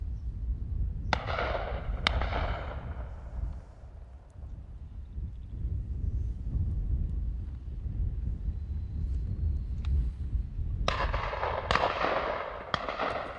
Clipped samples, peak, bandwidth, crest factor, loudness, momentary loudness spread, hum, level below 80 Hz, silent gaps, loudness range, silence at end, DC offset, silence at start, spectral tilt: under 0.1%; -6 dBFS; 8.4 kHz; 26 dB; -34 LUFS; 14 LU; none; -36 dBFS; none; 8 LU; 0 s; under 0.1%; 0 s; -6 dB/octave